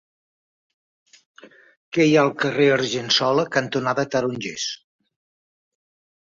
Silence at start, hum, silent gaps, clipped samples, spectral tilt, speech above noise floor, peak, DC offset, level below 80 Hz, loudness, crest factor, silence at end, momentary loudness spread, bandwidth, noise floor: 1.45 s; none; 1.77-1.92 s; under 0.1%; -4 dB/octave; over 70 dB; -4 dBFS; under 0.1%; -66 dBFS; -20 LUFS; 20 dB; 1.55 s; 10 LU; 7.6 kHz; under -90 dBFS